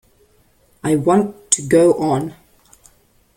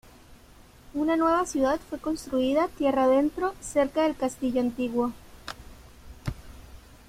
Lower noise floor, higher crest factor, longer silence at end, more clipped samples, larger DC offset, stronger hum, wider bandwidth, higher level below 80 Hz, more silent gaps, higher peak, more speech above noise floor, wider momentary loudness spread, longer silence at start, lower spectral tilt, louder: first, -56 dBFS vs -52 dBFS; about the same, 18 dB vs 16 dB; first, 1.05 s vs 0.3 s; neither; neither; neither; about the same, 16.5 kHz vs 16 kHz; about the same, -54 dBFS vs -50 dBFS; neither; first, 0 dBFS vs -10 dBFS; first, 41 dB vs 27 dB; second, 11 LU vs 17 LU; first, 0.85 s vs 0.3 s; about the same, -5 dB/octave vs -5 dB/octave; first, -16 LUFS vs -26 LUFS